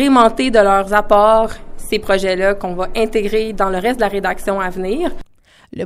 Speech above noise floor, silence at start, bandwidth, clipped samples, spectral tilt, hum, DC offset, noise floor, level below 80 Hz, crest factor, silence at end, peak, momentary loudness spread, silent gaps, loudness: 33 dB; 0 s; 15 kHz; under 0.1%; -5 dB/octave; none; under 0.1%; -48 dBFS; -30 dBFS; 16 dB; 0 s; 0 dBFS; 10 LU; none; -15 LUFS